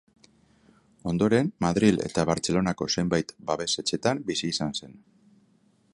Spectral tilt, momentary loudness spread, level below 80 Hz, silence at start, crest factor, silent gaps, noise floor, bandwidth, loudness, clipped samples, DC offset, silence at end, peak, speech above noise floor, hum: -5 dB/octave; 8 LU; -54 dBFS; 1.05 s; 20 dB; none; -64 dBFS; 11.5 kHz; -26 LUFS; under 0.1%; under 0.1%; 1 s; -6 dBFS; 38 dB; none